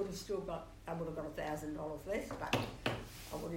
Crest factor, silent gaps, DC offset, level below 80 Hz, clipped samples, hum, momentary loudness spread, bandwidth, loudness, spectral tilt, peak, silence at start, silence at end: 22 dB; none; under 0.1%; -56 dBFS; under 0.1%; none; 8 LU; 16 kHz; -41 LUFS; -5 dB/octave; -18 dBFS; 0 s; 0 s